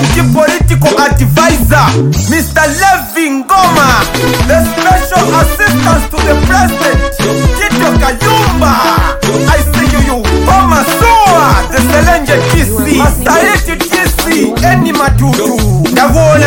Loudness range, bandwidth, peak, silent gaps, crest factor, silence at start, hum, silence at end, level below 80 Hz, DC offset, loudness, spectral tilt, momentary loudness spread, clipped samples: 1 LU; 17.5 kHz; 0 dBFS; none; 8 dB; 0 s; none; 0 s; -16 dBFS; under 0.1%; -8 LUFS; -5 dB/octave; 4 LU; 0.2%